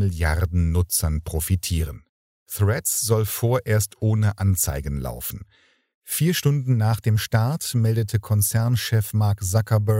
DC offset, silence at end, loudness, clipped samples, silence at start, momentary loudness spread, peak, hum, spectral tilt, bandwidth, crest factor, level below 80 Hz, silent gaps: under 0.1%; 0 s; -22 LUFS; under 0.1%; 0 s; 8 LU; -6 dBFS; none; -5 dB/octave; 16.5 kHz; 16 dB; -36 dBFS; 2.09-2.46 s, 5.94-6.02 s